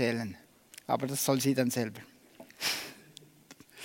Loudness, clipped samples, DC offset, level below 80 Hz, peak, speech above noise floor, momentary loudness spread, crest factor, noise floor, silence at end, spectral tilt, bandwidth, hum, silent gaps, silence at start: -31 LUFS; under 0.1%; under 0.1%; -76 dBFS; -12 dBFS; 26 dB; 24 LU; 20 dB; -57 dBFS; 0 s; -4 dB/octave; 16.5 kHz; none; none; 0 s